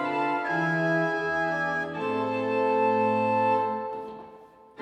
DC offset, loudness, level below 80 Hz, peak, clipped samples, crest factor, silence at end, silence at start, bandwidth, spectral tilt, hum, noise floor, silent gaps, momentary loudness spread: under 0.1%; -26 LUFS; -70 dBFS; -14 dBFS; under 0.1%; 14 dB; 0 s; 0 s; 9.2 kHz; -7 dB/octave; none; -50 dBFS; none; 9 LU